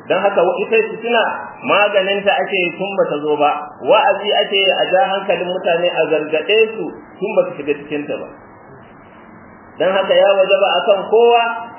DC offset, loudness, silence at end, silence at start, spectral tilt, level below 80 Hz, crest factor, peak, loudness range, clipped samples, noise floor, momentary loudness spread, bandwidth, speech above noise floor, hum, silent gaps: under 0.1%; -15 LUFS; 0 s; 0.05 s; -8 dB/octave; -64 dBFS; 16 dB; 0 dBFS; 5 LU; under 0.1%; -40 dBFS; 10 LU; 3.2 kHz; 25 dB; none; none